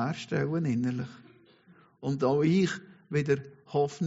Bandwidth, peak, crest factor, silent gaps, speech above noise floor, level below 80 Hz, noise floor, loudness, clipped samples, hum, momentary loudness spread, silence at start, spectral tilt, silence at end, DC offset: 8 kHz; -14 dBFS; 16 dB; none; 31 dB; -68 dBFS; -60 dBFS; -29 LUFS; under 0.1%; none; 12 LU; 0 s; -6.5 dB/octave; 0 s; under 0.1%